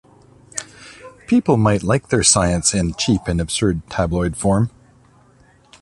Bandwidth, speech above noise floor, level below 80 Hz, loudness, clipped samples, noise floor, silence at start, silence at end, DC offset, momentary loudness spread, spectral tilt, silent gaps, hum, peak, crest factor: 11.5 kHz; 35 dB; -36 dBFS; -17 LUFS; under 0.1%; -52 dBFS; 0.55 s; 1.15 s; under 0.1%; 16 LU; -4.5 dB/octave; none; none; 0 dBFS; 20 dB